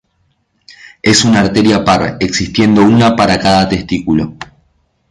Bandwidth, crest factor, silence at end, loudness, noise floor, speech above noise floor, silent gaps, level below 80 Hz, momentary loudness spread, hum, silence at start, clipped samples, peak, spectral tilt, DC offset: 11.5 kHz; 12 dB; 0.65 s; -11 LUFS; -60 dBFS; 50 dB; none; -36 dBFS; 8 LU; none; 1.05 s; under 0.1%; 0 dBFS; -5 dB/octave; under 0.1%